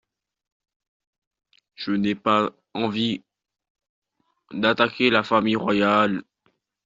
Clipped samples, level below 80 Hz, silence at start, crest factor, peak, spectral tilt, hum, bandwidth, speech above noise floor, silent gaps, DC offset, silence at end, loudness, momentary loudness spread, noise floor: under 0.1%; -64 dBFS; 1.8 s; 20 dB; -4 dBFS; -3 dB/octave; none; 7.6 kHz; 48 dB; 3.70-3.75 s, 3.89-4.02 s; under 0.1%; 0.65 s; -22 LUFS; 11 LU; -69 dBFS